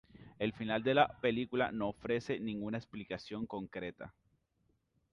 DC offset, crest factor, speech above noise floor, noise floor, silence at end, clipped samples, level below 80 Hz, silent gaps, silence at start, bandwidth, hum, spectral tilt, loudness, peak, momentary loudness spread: under 0.1%; 22 dB; 42 dB; -78 dBFS; 1 s; under 0.1%; -66 dBFS; none; 0.2 s; 11 kHz; none; -6.5 dB/octave; -36 LUFS; -16 dBFS; 14 LU